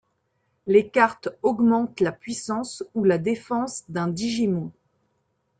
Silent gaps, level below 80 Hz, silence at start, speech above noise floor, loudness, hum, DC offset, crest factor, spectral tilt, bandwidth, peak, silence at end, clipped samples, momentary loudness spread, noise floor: none; -64 dBFS; 0.65 s; 49 dB; -24 LUFS; none; under 0.1%; 18 dB; -5.5 dB/octave; 9.4 kHz; -6 dBFS; 0.9 s; under 0.1%; 10 LU; -72 dBFS